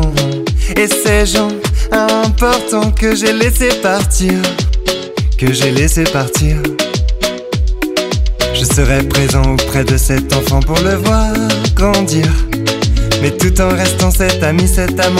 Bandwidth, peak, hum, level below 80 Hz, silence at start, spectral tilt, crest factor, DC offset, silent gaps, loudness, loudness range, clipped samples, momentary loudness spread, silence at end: 16.5 kHz; 0 dBFS; none; -16 dBFS; 0 s; -4.5 dB/octave; 12 dB; under 0.1%; none; -13 LUFS; 2 LU; under 0.1%; 4 LU; 0 s